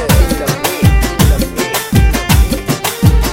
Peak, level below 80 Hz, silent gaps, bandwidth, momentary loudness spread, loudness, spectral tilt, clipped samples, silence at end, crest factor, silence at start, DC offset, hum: 0 dBFS; -14 dBFS; none; 17.5 kHz; 4 LU; -13 LUFS; -5 dB/octave; under 0.1%; 0 s; 10 dB; 0 s; under 0.1%; none